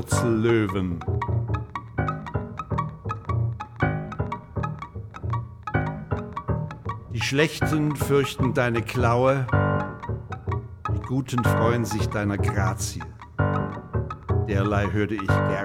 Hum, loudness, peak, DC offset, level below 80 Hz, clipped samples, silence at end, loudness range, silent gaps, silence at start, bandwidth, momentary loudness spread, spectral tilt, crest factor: none; -26 LUFS; -6 dBFS; under 0.1%; -40 dBFS; under 0.1%; 0 s; 6 LU; none; 0 s; 16.5 kHz; 10 LU; -6.5 dB/octave; 18 dB